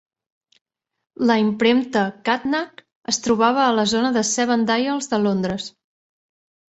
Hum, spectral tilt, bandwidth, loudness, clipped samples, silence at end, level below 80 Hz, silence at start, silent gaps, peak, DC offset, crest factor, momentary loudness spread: none; -4 dB/octave; 8.2 kHz; -20 LUFS; under 0.1%; 1.05 s; -58 dBFS; 1.2 s; 2.95-3.02 s; -4 dBFS; under 0.1%; 18 dB; 8 LU